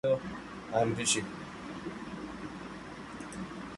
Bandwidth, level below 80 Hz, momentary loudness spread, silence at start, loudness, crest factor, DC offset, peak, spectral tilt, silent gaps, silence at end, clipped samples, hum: 11.5 kHz; -58 dBFS; 14 LU; 0.05 s; -35 LUFS; 20 dB; under 0.1%; -14 dBFS; -3.5 dB/octave; none; 0 s; under 0.1%; none